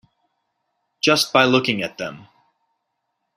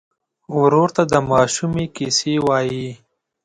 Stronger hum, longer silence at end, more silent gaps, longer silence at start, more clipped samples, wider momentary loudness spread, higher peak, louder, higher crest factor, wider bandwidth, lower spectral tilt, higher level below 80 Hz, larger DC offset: neither; first, 1.2 s vs 0.5 s; neither; first, 1.05 s vs 0.5 s; neither; first, 15 LU vs 10 LU; about the same, -2 dBFS vs -2 dBFS; about the same, -18 LUFS vs -18 LUFS; about the same, 22 dB vs 18 dB; first, 16 kHz vs 11 kHz; about the same, -3.5 dB/octave vs -4.5 dB/octave; second, -64 dBFS vs -50 dBFS; neither